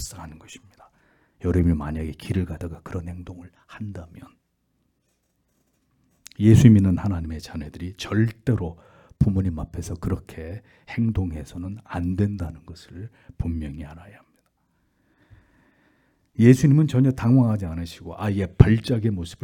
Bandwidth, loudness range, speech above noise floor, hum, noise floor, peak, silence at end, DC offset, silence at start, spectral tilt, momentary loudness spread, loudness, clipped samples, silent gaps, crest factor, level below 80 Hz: 13.5 kHz; 17 LU; 49 dB; none; -71 dBFS; 0 dBFS; 0.1 s; under 0.1%; 0 s; -8 dB/octave; 23 LU; -22 LUFS; under 0.1%; none; 24 dB; -42 dBFS